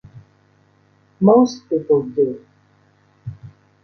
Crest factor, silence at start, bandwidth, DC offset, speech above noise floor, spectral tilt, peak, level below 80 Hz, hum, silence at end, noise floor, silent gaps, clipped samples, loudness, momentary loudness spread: 18 dB; 0.15 s; 6.6 kHz; under 0.1%; 41 dB; -8.5 dB/octave; -2 dBFS; -60 dBFS; none; 0.35 s; -57 dBFS; none; under 0.1%; -17 LUFS; 23 LU